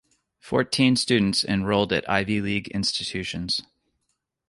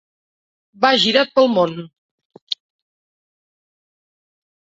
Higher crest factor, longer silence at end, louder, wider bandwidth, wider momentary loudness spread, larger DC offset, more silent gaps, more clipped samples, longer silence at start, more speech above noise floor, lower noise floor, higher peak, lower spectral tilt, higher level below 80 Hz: about the same, 20 dB vs 20 dB; second, 0.85 s vs 2.25 s; second, -23 LUFS vs -17 LUFS; first, 11.5 kHz vs 7.8 kHz; second, 7 LU vs 14 LU; neither; second, none vs 1.98-2.18 s, 2.25-2.30 s, 2.42-2.47 s; neither; second, 0.45 s vs 0.8 s; second, 53 dB vs over 74 dB; second, -77 dBFS vs under -90 dBFS; about the same, -4 dBFS vs -2 dBFS; about the same, -4.5 dB/octave vs -4 dB/octave; first, -50 dBFS vs -68 dBFS